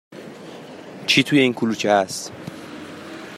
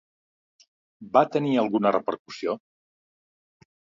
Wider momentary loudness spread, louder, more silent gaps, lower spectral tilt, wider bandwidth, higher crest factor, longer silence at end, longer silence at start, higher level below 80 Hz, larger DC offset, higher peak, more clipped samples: first, 22 LU vs 10 LU; first, -19 LUFS vs -25 LUFS; second, none vs 2.19-2.25 s; second, -4 dB/octave vs -7 dB/octave; first, 14.5 kHz vs 7.6 kHz; about the same, 20 dB vs 24 dB; second, 0 s vs 1.4 s; second, 0.1 s vs 1 s; first, -64 dBFS vs -74 dBFS; neither; about the same, -2 dBFS vs -4 dBFS; neither